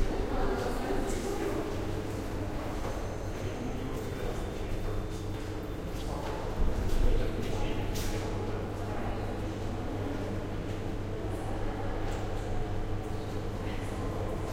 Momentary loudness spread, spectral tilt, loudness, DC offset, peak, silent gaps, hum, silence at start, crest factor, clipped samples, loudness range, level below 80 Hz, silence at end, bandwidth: 4 LU; -6 dB/octave; -35 LUFS; under 0.1%; -14 dBFS; none; none; 0 s; 16 dB; under 0.1%; 2 LU; -36 dBFS; 0 s; 16 kHz